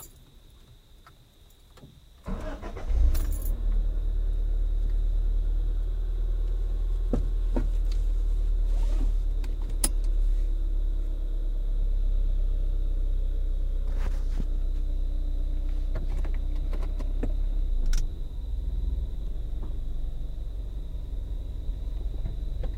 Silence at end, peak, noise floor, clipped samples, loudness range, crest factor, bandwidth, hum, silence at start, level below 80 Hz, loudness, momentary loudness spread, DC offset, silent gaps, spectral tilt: 0 s; -6 dBFS; -54 dBFS; under 0.1%; 5 LU; 20 dB; 16 kHz; none; 0 s; -26 dBFS; -33 LUFS; 8 LU; under 0.1%; none; -6 dB/octave